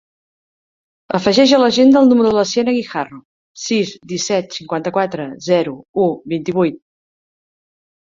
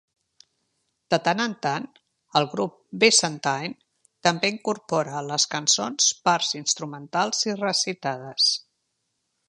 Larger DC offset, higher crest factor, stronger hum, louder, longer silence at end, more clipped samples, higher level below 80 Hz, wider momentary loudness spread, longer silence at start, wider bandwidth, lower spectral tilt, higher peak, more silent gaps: neither; second, 16 dB vs 24 dB; neither; first, -16 LUFS vs -23 LUFS; first, 1.25 s vs 0.9 s; neither; first, -58 dBFS vs -74 dBFS; first, 13 LU vs 10 LU; about the same, 1.1 s vs 1.1 s; second, 7.6 kHz vs 11.5 kHz; first, -4.5 dB/octave vs -2 dB/octave; about the same, 0 dBFS vs -2 dBFS; first, 3.25-3.55 s, 5.89-5.94 s vs none